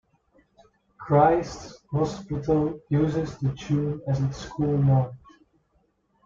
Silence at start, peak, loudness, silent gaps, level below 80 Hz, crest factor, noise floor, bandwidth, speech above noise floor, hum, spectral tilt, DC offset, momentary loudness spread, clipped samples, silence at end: 1 s; -6 dBFS; -25 LUFS; none; -50 dBFS; 20 dB; -68 dBFS; 7.4 kHz; 44 dB; none; -8 dB/octave; under 0.1%; 11 LU; under 0.1%; 1.1 s